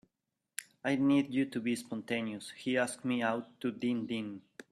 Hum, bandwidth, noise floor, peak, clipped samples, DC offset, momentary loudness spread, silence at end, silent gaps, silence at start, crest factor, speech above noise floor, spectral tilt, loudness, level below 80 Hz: none; 14 kHz; -87 dBFS; -16 dBFS; under 0.1%; under 0.1%; 15 LU; 0.1 s; none; 0.6 s; 18 dB; 54 dB; -5 dB/octave; -34 LUFS; -76 dBFS